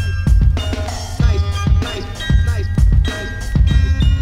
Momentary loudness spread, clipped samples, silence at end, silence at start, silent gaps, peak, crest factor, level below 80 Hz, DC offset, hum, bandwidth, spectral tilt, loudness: 8 LU; under 0.1%; 0 s; 0 s; none; -2 dBFS; 12 dB; -16 dBFS; under 0.1%; none; 11.5 kHz; -6 dB/octave; -17 LUFS